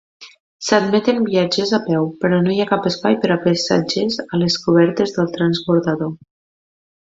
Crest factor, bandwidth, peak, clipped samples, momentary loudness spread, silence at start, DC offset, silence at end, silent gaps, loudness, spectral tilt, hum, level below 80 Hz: 16 dB; 7.8 kHz; 0 dBFS; under 0.1%; 5 LU; 0.2 s; under 0.1%; 1 s; 0.40-0.60 s; -17 LUFS; -5.5 dB/octave; none; -56 dBFS